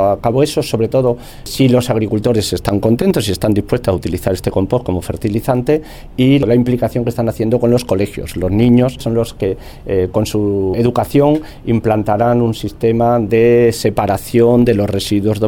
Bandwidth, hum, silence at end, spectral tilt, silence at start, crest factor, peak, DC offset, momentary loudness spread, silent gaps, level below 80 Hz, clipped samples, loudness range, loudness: 18.5 kHz; none; 0 s; -7 dB/octave; 0 s; 14 dB; 0 dBFS; under 0.1%; 7 LU; none; -34 dBFS; under 0.1%; 3 LU; -14 LUFS